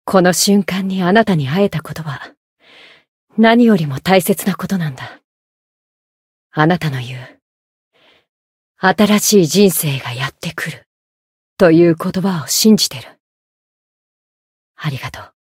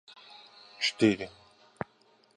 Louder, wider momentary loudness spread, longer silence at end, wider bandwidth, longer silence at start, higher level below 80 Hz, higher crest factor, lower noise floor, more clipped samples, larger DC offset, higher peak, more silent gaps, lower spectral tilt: first, -14 LUFS vs -28 LUFS; second, 16 LU vs 25 LU; second, 0.2 s vs 1.1 s; first, 16.5 kHz vs 10.5 kHz; second, 0.05 s vs 0.8 s; first, -54 dBFS vs -68 dBFS; second, 16 dB vs 24 dB; second, -45 dBFS vs -65 dBFS; neither; neither; first, 0 dBFS vs -10 dBFS; first, 2.37-2.57 s, 3.08-3.27 s, 5.24-6.50 s, 7.42-7.91 s, 8.29-8.75 s, 10.86-11.57 s, 13.20-14.74 s vs none; about the same, -4.5 dB/octave vs -4.5 dB/octave